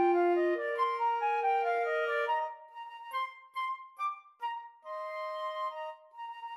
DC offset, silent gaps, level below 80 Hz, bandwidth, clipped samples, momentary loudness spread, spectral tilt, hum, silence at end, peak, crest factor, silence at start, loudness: under 0.1%; none; under -90 dBFS; 12 kHz; under 0.1%; 14 LU; -2.5 dB/octave; none; 0 s; -18 dBFS; 14 dB; 0 s; -33 LUFS